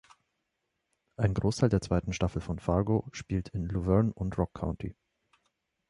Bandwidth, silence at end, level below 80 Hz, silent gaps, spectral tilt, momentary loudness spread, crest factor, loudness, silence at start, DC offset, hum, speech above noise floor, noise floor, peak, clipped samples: 11 kHz; 1 s; -44 dBFS; none; -7.5 dB/octave; 9 LU; 20 dB; -31 LUFS; 1.2 s; under 0.1%; none; 53 dB; -82 dBFS; -12 dBFS; under 0.1%